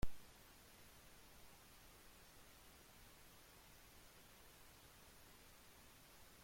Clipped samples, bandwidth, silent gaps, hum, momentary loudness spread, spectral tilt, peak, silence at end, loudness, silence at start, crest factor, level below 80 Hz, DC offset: under 0.1%; 16.5 kHz; none; none; 0 LU; -3.5 dB/octave; -28 dBFS; 0 s; -63 LUFS; 0 s; 24 dB; -62 dBFS; under 0.1%